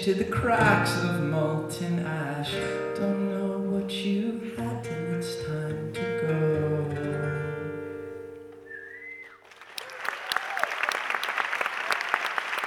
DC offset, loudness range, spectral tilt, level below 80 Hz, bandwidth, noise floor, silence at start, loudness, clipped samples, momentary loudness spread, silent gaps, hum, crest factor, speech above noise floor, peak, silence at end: under 0.1%; 8 LU; -5.5 dB/octave; -58 dBFS; 19 kHz; -49 dBFS; 0 s; -28 LUFS; under 0.1%; 15 LU; none; none; 22 dB; 22 dB; -6 dBFS; 0 s